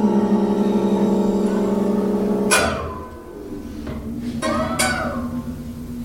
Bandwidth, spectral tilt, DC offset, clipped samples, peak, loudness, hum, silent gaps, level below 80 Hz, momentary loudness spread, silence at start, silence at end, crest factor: 16.5 kHz; -5 dB/octave; under 0.1%; under 0.1%; -4 dBFS; -20 LUFS; none; none; -40 dBFS; 15 LU; 0 s; 0 s; 18 dB